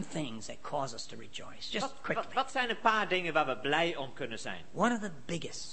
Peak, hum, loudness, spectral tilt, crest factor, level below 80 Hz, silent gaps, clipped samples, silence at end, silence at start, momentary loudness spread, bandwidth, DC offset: -10 dBFS; none; -33 LUFS; -4 dB/octave; 24 dB; -66 dBFS; none; under 0.1%; 0 s; 0 s; 13 LU; 8.8 kHz; 0.8%